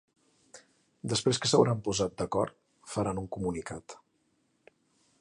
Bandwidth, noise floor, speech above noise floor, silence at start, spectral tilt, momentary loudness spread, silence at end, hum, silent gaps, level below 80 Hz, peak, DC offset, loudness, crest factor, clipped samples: 11.5 kHz; -73 dBFS; 44 dB; 0.55 s; -4.5 dB/octave; 17 LU; 1.25 s; none; none; -58 dBFS; -8 dBFS; under 0.1%; -30 LUFS; 24 dB; under 0.1%